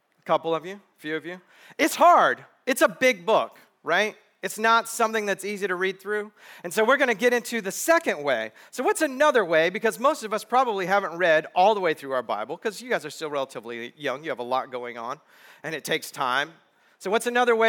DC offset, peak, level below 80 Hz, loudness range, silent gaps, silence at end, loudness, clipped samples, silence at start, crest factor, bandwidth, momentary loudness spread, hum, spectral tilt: under 0.1%; -6 dBFS; -78 dBFS; 8 LU; none; 0 s; -24 LUFS; under 0.1%; 0.25 s; 18 dB; over 20 kHz; 14 LU; none; -3 dB/octave